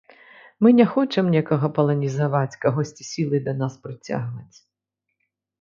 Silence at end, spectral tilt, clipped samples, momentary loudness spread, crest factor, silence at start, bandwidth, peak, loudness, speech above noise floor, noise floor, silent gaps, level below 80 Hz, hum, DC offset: 1.15 s; -7.5 dB/octave; under 0.1%; 12 LU; 18 dB; 0.6 s; 7.4 kHz; -4 dBFS; -21 LUFS; 60 dB; -81 dBFS; none; -64 dBFS; none; under 0.1%